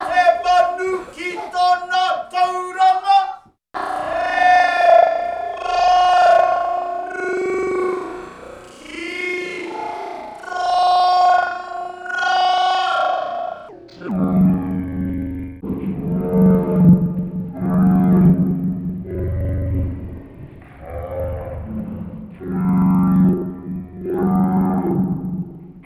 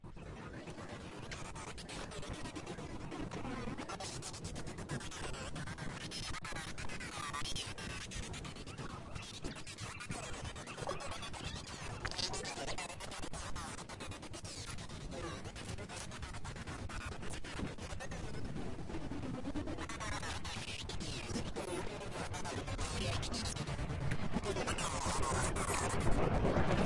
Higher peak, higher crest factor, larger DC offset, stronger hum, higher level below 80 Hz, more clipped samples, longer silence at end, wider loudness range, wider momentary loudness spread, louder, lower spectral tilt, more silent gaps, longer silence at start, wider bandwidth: first, -2 dBFS vs -20 dBFS; about the same, 16 dB vs 20 dB; neither; neither; first, -40 dBFS vs -50 dBFS; neither; about the same, 0.05 s vs 0 s; about the same, 9 LU vs 7 LU; first, 16 LU vs 10 LU; first, -18 LUFS vs -42 LUFS; first, -7 dB/octave vs -4 dB/octave; neither; about the same, 0 s vs 0 s; about the same, 12.5 kHz vs 12 kHz